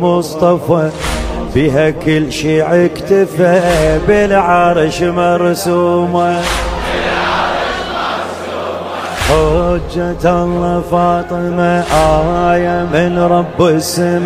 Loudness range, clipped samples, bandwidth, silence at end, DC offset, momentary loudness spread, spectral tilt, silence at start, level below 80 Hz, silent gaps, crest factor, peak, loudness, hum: 4 LU; under 0.1%; 16 kHz; 0 s; under 0.1%; 7 LU; -5.5 dB/octave; 0 s; -28 dBFS; none; 12 dB; 0 dBFS; -13 LUFS; none